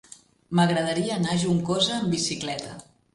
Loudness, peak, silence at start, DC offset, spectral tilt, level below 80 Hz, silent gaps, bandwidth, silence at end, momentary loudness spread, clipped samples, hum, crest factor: -25 LUFS; -8 dBFS; 0.5 s; under 0.1%; -4.5 dB/octave; -58 dBFS; none; 11.5 kHz; 0.3 s; 11 LU; under 0.1%; none; 18 dB